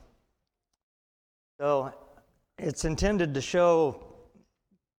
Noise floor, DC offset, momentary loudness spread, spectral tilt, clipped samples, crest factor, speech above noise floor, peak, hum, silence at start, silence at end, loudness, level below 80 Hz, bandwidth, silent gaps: -82 dBFS; under 0.1%; 13 LU; -5.5 dB/octave; under 0.1%; 18 dB; 56 dB; -12 dBFS; none; 1.6 s; 0.9 s; -27 LUFS; -46 dBFS; 12 kHz; none